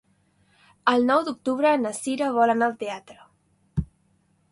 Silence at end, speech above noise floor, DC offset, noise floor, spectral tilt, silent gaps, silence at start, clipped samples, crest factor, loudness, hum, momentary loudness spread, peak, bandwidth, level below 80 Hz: 0.65 s; 43 dB; under 0.1%; -65 dBFS; -5 dB/octave; none; 0.85 s; under 0.1%; 20 dB; -24 LUFS; none; 13 LU; -4 dBFS; 11.5 kHz; -48 dBFS